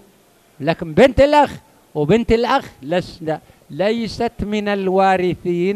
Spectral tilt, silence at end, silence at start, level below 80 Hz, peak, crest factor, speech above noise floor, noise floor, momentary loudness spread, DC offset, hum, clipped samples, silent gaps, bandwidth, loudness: -6.5 dB/octave; 0 s; 0.6 s; -38 dBFS; -2 dBFS; 16 dB; 36 dB; -53 dBFS; 12 LU; under 0.1%; none; under 0.1%; none; 14 kHz; -17 LUFS